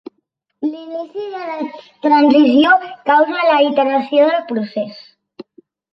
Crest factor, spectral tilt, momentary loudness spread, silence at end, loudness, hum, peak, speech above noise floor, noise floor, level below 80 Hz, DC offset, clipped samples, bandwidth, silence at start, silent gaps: 14 dB; -6.5 dB/octave; 16 LU; 0.5 s; -15 LUFS; none; 0 dBFS; 55 dB; -69 dBFS; -66 dBFS; under 0.1%; under 0.1%; 5.8 kHz; 0.6 s; none